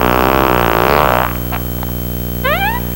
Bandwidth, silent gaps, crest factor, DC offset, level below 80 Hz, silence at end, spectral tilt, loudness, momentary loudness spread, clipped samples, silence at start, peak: 20 kHz; none; 14 dB; under 0.1%; -24 dBFS; 0 s; -5.5 dB/octave; -14 LUFS; 8 LU; 0.6%; 0 s; 0 dBFS